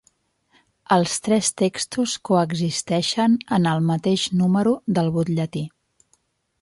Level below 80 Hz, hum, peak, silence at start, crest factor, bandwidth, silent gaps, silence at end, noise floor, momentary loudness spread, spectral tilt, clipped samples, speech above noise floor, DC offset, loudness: -60 dBFS; none; -4 dBFS; 0.9 s; 16 dB; 11.5 kHz; none; 0.95 s; -66 dBFS; 5 LU; -5 dB/octave; under 0.1%; 45 dB; under 0.1%; -21 LUFS